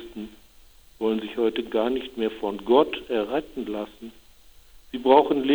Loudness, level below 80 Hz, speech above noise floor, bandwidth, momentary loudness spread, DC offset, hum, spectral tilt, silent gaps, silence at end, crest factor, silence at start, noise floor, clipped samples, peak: -24 LUFS; -54 dBFS; 29 dB; over 20 kHz; 20 LU; 0.1%; none; -6 dB/octave; none; 0 s; 22 dB; 0 s; -53 dBFS; under 0.1%; -4 dBFS